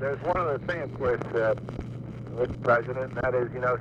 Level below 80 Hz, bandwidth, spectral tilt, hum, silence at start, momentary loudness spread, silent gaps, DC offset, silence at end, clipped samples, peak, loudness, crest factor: -48 dBFS; 8.2 kHz; -8 dB/octave; none; 0 s; 12 LU; none; under 0.1%; 0 s; under 0.1%; -12 dBFS; -28 LUFS; 16 dB